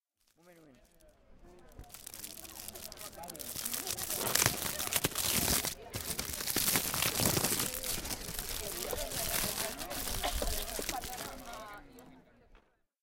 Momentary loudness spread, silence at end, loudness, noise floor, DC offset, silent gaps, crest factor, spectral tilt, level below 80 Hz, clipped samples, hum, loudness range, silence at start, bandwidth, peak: 16 LU; 0.45 s; -33 LUFS; -66 dBFS; under 0.1%; none; 30 dB; -2 dB/octave; -50 dBFS; under 0.1%; none; 11 LU; 0.45 s; 17 kHz; -6 dBFS